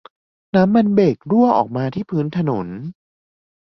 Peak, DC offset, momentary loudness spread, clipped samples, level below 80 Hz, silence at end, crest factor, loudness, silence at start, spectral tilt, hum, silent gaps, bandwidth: -2 dBFS; under 0.1%; 12 LU; under 0.1%; -56 dBFS; 0.9 s; 16 dB; -17 LUFS; 0.55 s; -9.5 dB/octave; none; none; 6.2 kHz